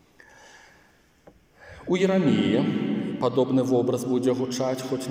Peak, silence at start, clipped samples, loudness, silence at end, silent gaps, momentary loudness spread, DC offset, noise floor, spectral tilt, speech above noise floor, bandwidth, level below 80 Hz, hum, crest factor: -10 dBFS; 1.65 s; under 0.1%; -24 LUFS; 0 s; none; 7 LU; under 0.1%; -59 dBFS; -6.5 dB/octave; 36 dB; 16 kHz; -64 dBFS; none; 16 dB